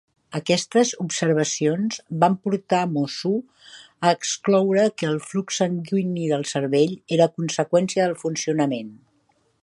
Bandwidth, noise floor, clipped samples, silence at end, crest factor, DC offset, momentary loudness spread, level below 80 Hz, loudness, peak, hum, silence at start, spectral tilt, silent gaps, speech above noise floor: 11.5 kHz; -65 dBFS; under 0.1%; 0.65 s; 20 dB; under 0.1%; 6 LU; -68 dBFS; -22 LUFS; -4 dBFS; none; 0.3 s; -5 dB/octave; none; 43 dB